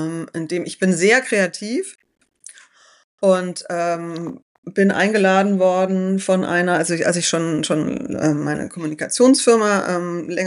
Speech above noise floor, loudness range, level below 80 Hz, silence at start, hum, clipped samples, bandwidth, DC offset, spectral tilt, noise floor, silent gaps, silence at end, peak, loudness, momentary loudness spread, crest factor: 32 dB; 5 LU; -62 dBFS; 0 s; none; under 0.1%; 11.5 kHz; under 0.1%; -4.5 dB/octave; -50 dBFS; 3.04-3.18 s, 4.42-4.63 s; 0 s; -2 dBFS; -18 LUFS; 11 LU; 16 dB